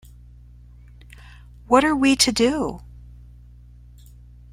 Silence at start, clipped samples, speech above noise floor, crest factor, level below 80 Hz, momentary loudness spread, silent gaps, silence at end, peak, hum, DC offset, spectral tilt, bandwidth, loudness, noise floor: 1.7 s; under 0.1%; 27 dB; 22 dB; -44 dBFS; 12 LU; none; 1.7 s; -2 dBFS; 60 Hz at -40 dBFS; under 0.1%; -3 dB/octave; 16 kHz; -19 LUFS; -45 dBFS